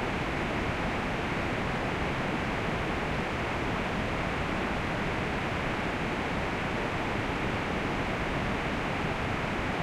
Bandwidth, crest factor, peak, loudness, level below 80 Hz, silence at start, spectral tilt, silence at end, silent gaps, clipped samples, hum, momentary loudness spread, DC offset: 15.5 kHz; 12 dB; -18 dBFS; -31 LUFS; -42 dBFS; 0 s; -5.5 dB/octave; 0 s; none; under 0.1%; none; 0 LU; under 0.1%